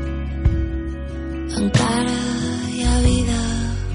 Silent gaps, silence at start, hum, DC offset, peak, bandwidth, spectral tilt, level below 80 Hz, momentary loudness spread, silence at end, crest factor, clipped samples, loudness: none; 0 s; none; under 0.1%; -6 dBFS; 11 kHz; -5.5 dB/octave; -24 dBFS; 10 LU; 0 s; 14 dB; under 0.1%; -21 LUFS